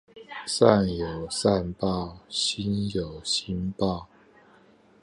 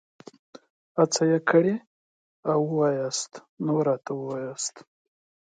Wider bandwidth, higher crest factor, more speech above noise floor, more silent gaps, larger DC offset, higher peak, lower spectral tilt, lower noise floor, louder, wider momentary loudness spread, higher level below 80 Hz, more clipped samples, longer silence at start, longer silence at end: first, 11.5 kHz vs 9.6 kHz; first, 26 dB vs 20 dB; second, 31 dB vs over 65 dB; second, none vs 1.87-2.43 s, 3.49-3.57 s; neither; first, -2 dBFS vs -6 dBFS; about the same, -5 dB/octave vs -5 dB/octave; second, -57 dBFS vs under -90 dBFS; about the same, -26 LUFS vs -26 LUFS; about the same, 12 LU vs 12 LU; first, -48 dBFS vs -76 dBFS; neither; second, 0.15 s vs 0.95 s; first, 0.95 s vs 0.7 s